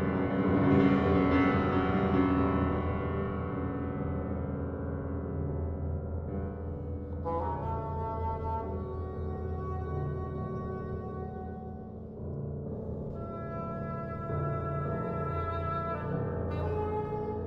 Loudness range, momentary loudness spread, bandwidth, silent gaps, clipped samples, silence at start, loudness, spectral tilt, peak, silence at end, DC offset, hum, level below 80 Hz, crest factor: 10 LU; 12 LU; 5.6 kHz; none; under 0.1%; 0 s; -32 LUFS; -10 dB/octave; -12 dBFS; 0 s; under 0.1%; none; -48 dBFS; 20 dB